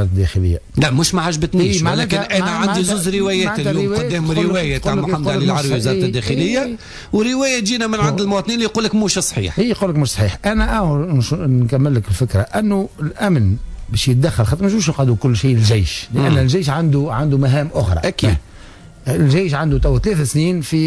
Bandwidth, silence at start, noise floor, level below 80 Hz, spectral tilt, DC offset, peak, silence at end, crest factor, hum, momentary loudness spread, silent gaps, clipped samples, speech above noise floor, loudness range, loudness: 11 kHz; 0 s; -38 dBFS; -30 dBFS; -5.5 dB/octave; under 0.1%; -4 dBFS; 0 s; 12 dB; none; 4 LU; none; under 0.1%; 22 dB; 2 LU; -16 LUFS